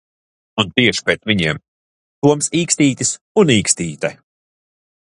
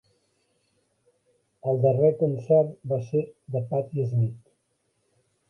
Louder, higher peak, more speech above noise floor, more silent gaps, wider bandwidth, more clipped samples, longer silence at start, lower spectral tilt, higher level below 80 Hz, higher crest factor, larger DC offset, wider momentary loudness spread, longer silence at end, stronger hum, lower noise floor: first, -16 LUFS vs -25 LUFS; first, 0 dBFS vs -8 dBFS; first, over 74 dB vs 49 dB; first, 1.68-2.22 s, 3.21-3.35 s vs none; first, 11.5 kHz vs 6.2 kHz; neither; second, 0.55 s vs 1.65 s; second, -3.5 dB/octave vs -11 dB/octave; first, -50 dBFS vs -66 dBFS; about the same, 18 dB vs 18 dB; neither; about the same, 10 LU vs 9 LU; about the same, 1 s vs 1.1 s; neither; first, under -90 dBFS vs -73 dBFS